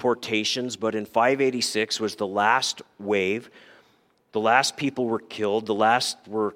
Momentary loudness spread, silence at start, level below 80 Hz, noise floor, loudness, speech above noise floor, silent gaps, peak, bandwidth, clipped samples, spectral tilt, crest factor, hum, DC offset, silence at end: 7 LU; 0 s; -74 dBFS; -63 dBFS; -24 LUFS; 39 dB; none; -4 dBFS; 16.5 kHz; under 0.1%; -3 dB/octave; 22 dB; none; under 0.1%; 0 s